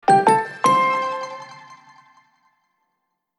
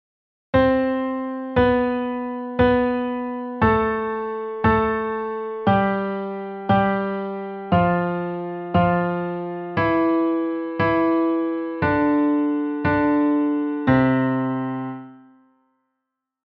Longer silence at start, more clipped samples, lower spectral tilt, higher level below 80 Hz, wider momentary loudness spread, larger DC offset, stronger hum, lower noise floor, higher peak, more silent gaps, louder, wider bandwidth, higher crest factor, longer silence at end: second, 0.05 s vs 0.55 s; neither; second, -4.5 dB/octave vs -10 dB/octave; second, -80 dBFS vs -44 dBFS; first, 20 LU vs 9 LU; neither; neither; second, -75 dBFS vs -81 dBFS; about the same, -2 dBFS vs -4 dBFS; neither; first, -18 LUFS vs -21 LUFS; first, 12.5 kHz vs 5.6 kHz; about the same, 18 dB vs 16 dB; first, 1.65 s vs 1.3 s